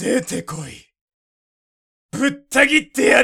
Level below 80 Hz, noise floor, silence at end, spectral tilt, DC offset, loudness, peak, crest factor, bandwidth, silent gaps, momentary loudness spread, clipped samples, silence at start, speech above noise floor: -54 dBFS; under -90 dBFS; 0 s; -3.5 dB/octave; under 0.1%; -17 LUFS; 0 dBFS; 20 dB; 17 kHz; 1.01-1.08 s, 1.14-2.09 s; 18 LU; under 0.1%; 0 s; over 72 dB